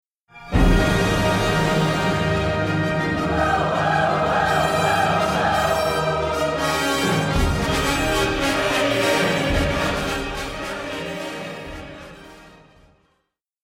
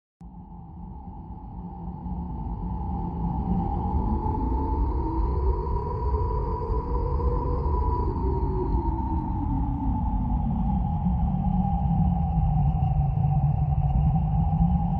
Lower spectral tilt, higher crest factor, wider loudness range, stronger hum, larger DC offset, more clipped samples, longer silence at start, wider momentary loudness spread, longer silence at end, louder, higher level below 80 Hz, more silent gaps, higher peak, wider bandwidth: second, -5 dB/octave vs -12.5 dB/octave; about the same, 16 dB vs 16 dB; about the same, 7 LU vs 6 LU; neither; neither; neither; first, 0.35 s vs 0.2 s; second, 10 LU vs 14 LU; first, 1.15 s vs 0 s; first, -20 LUFS vs -27 LUFS; about the same, -32 dBFS vs -28 dBFS; neither; first, -4 dBFS vs -10 dBFS; first, 16.5 kHz vs 4.8 kHz